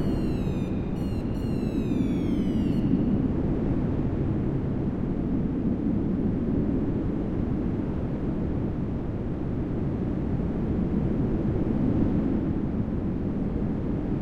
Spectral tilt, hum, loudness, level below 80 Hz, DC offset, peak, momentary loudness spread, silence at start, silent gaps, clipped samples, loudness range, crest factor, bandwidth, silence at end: -10 dB/octave; none; -27 LUFS; -36 dBFS; under 0.1%; -12 dBFS; 4 LU; 0 s; none; under 0.1%; 3 LU; 14 dB; 9 kHz; 0 s